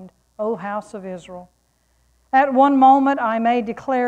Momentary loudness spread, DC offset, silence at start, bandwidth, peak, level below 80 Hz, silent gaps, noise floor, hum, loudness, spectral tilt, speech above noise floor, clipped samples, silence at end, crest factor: 20 LU; under 0.1%; 0 s; 9 kHz; -2 dBFS; -60 dBFS; none; -63 dBFS; none; -18 LUFS; -6.5 dB/octave; 45 dB; under 0.1%; 0 s; 16 dB